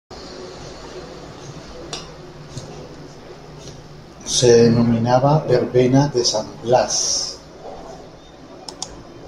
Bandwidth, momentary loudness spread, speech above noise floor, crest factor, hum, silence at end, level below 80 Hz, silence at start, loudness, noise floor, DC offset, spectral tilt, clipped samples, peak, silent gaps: 13 kHz; 23 LU; 25 dB; 18 dB; none; 0 s; -46 dBFS; 0.1 s; -16 LUFS; -41 dBFS; under 0.1%; -4.5 dB/octave; under 0.1%; -2 dBFS; none